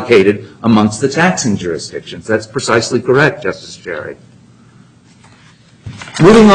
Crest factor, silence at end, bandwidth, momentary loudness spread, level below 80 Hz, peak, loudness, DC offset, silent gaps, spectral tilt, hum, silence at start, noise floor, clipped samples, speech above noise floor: 12 dB; 0 s; 10 kHz; 16 LU; -40 dBFS; 0 dBFS; -13 LUFS; under 0.1%; none; -5.5 dB/octave; none; 0 s; -44 dBFS; under 0.1%; 33 dB